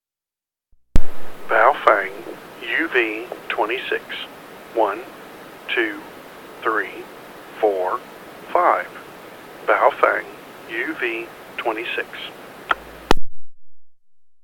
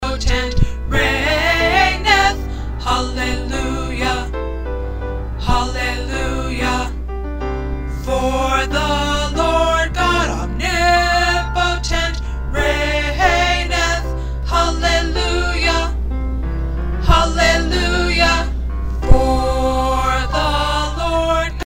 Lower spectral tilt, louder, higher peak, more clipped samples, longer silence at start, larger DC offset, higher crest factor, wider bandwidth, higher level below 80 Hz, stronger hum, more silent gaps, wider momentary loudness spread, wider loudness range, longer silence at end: about the same, -4.5 dB/octave vs -4.5 dB/octave; second, -22 LUFS vs -17 LUFS; about the same, 0 dBFS vs 0 dBFS; first, 0.1% vs under 0.1%; first, 0.95 s vs 0 s; second, under 0.1% vs 0.6%; about the same, 20 dB vs 16 dB; about the same, 16 kHz vs 16 kHz; second, -32 dBFS vs -22 dBFS; neither; neither; first, 21 LU vs 10 LU; about the same, 5 LU vs 5 LU; first, 0.5 s vs 0.05 s